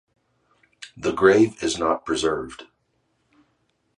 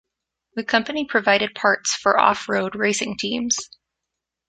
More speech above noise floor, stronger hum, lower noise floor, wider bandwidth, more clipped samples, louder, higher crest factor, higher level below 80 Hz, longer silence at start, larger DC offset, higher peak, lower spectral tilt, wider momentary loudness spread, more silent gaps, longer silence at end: second, 49 dB vs 62 dB; neither; second, -70 dBFS vs -83 dBFS; first, 11 kHz vs 9.6 kHz; neither; about the same, -21 LUFS vs -20 LUFS; about the same, 22 dB vs 22 dB; first, -54 dBFS vs -62 dBFS; first, 0.8 s vs 0.55 s; neither; about the same, -2 dBFS vs -2 dBFS; first, -4.5 dB/octave vs -2 dB/octave; first, 26 LU vs 7 LU; neither; first, 1.35 s vs 0.85 s